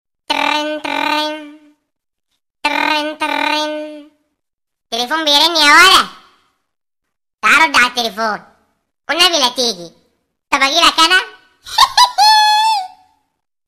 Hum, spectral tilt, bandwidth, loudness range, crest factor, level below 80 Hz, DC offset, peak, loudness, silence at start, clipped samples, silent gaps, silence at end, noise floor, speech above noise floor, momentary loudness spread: none; 0 dB/octave; 16.5 kHz; 8 LU; 16 dB; -52 dBFS; under 0.1%; 0 dBFS; -12 LUFS; 0.3 s; under 0.1%; 4.54-4.58 s; 0.8 s; -77 dBFS; 64 dB; 14 LU